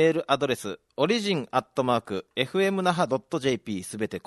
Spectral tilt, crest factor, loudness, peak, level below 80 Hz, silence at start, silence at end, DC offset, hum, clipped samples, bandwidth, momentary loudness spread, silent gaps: -5 dB/octave; 18 dB; -26 LUFS; -8 dBFS; -66 dBFS; 0 s; 0.05 s; under 0.1%; none; under 0.1%; 12.5 kHz; 8 LU; none